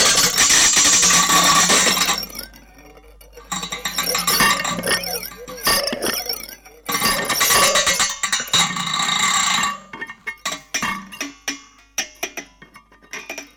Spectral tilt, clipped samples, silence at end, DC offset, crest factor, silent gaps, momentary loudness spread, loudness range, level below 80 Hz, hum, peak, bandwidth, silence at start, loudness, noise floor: 0 dB/octave; under 0.1%; 0.1 s; under 0.1%; 18 dB; none; 19 LU; 10 LU; -46 dBFS; none; -2 dBFS; over 20 kHz; 0 s; -16 LUFS; -47 dBFS